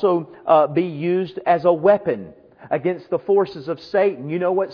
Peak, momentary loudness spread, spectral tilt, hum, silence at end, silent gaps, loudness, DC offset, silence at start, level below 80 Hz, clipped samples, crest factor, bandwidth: -2 dBFS; 9 LU; -9 dB/octave; none; 0 s; none; -20 LUFS; under 0.1%; 0 s; -64 dBFS; under 0.1%; 18 dB; 5.4 kHz